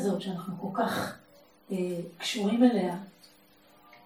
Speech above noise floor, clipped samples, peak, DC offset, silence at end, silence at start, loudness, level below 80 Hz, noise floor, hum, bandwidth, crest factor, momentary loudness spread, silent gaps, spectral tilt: 31 dB; under 0.1%; -10 dBFS; under 0.1%; 0.1 s; 0 s; -30 LUFS; -74 dBFS; -60 dBFS; none; 15.5 kHz; 20 dB; 15 LU; none; -5.5 dB/octave